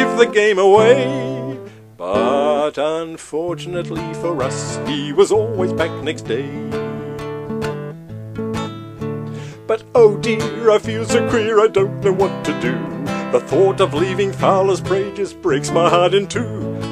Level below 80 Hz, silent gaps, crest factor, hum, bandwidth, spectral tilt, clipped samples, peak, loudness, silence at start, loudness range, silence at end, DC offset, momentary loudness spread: -48 dBFS; none; 18 dB; none; 13 kHz; -5.5 dB/octave; under 0.1%; 0 dBFS; -17 LUFS; 0 s; 8 LU; 0 s; under 0.1%; 14 LU